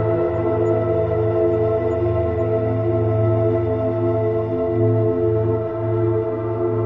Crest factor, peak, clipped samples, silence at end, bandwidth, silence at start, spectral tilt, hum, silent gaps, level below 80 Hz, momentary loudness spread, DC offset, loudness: 12 dB; -6 dBFS; under 0.1%; 0 s; 3.8 kHz; 0 s; -11.5 dB/octave; none; none; -46 dBFS; 3 LU; under 0.1%; -20 LUFS